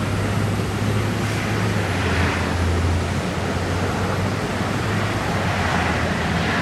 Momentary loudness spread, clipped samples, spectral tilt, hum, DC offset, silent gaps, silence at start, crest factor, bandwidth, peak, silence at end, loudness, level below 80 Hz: 3 LU; under 0.1%; -5.5 dB/octave; none; under 0.1%; none; 0 s; 14 dB; 15 kHz; -8 dBFS; 0 s; -22 LUFS; -34 dBFS